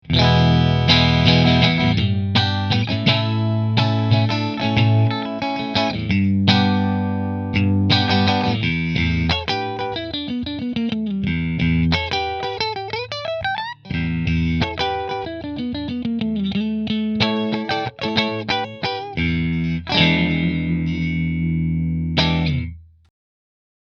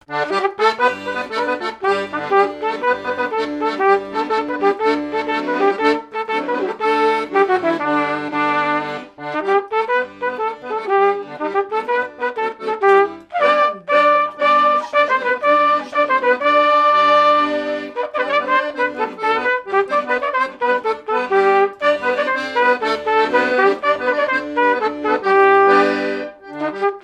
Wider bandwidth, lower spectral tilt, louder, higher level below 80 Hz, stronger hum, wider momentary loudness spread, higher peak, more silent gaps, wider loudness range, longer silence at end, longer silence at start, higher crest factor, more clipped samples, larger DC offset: second, 7 kHz vs 9.8 kHz; first, -6.5 dB/octave vs -4.5 dB/octave; about the same, -19 LUFS vs -17 LUFS; first, -36 dBFS vs -62 dBFS; neither; about the same, 10 LU vs 9 LU; about the same, 0 dBFS vs 0 dBFS; neither; about the same, 6 LU vs 5 LU; first, 1 s vs 0.05 s; about the same, 0.05 s vs 0.1 s; about the same, 20 dB vs 18 dB; neither; neither